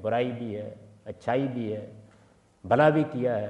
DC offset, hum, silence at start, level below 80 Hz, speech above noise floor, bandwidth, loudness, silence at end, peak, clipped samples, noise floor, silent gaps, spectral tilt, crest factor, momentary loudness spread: under 0.1%; none; 0 s; -68 dBFS; 33 dB; 9.4 kHz; -27 LUFS; 0 s; -8 dBFS; under 0.1%; -59 dBFS; none; -8 dB/octave; 20 dB; 23 LU